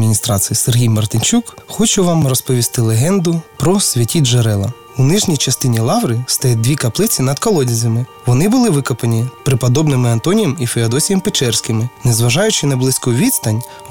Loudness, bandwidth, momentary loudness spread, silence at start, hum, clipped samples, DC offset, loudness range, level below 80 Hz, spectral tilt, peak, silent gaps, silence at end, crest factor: -14 LUFS; 19 kHz; 4 LU; 0 s; none; under 0.1%; under 0.1%; 1 LU; -42 dBFS; -4.5 dB/octave; -4 dBFS; none; 0 s; 8 dB